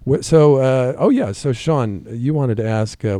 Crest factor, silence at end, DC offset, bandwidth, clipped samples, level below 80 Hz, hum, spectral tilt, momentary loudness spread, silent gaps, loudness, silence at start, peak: 16 dB; 0 s; under 0.1%; 11.5 kHz; under 0.1%; -46 dBFS; none; -7.5 dB/octave; 9 LU; none; -17 LUFS; 0 s; 0 dBFS